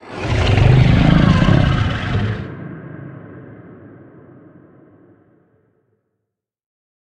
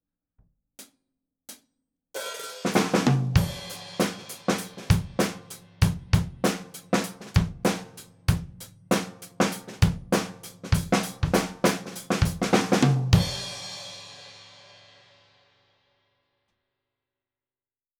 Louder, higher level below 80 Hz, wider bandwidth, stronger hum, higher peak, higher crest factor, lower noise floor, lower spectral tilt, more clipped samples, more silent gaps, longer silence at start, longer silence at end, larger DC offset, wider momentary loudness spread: first, -15 LUFS vs -26 LUFS; first, -28 dBFS vs -40 dBFS; second, 8.8 kHz vs over 20 kHz; neither; first, 0 dBFS vs -4 dBFS; about the same, 18 dB vs 22 dB; second, -78 dBFS vs under -90 dBFS; first, -7.5 dB/octave vs -5.5 dB/octave; neither; neither; second, 0.05 s vs 0.8 s; second, 3.35 s vs 3.55 s; neither; first, 23 LU vs 19 LU